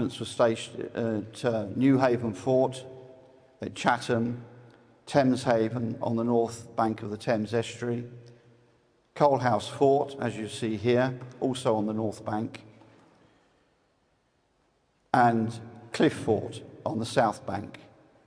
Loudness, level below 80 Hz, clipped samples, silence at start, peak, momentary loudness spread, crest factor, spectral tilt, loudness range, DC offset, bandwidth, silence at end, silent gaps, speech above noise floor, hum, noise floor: -28 LUFS; -68 dBFS; under 0.1%; 0 s; -8 dBFS; 13 LU; 22 dB; -6 dB/octave; 4 LU; under 0.1%; 10.5 kHz; 0.45 s; none; 43 dB; none; -70 dBFS